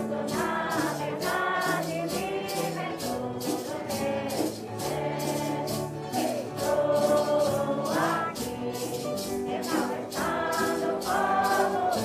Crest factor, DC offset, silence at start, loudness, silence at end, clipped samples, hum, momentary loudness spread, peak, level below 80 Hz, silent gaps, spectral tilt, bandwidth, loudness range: 16 dB; under 0.1%; 0 s; -28 LUFS; 0 s; under 0.1%; none; 7 LU; -12 dBFS; -58 dBFS; none; -4.5 dB/octave; 16 kHz; 4 LU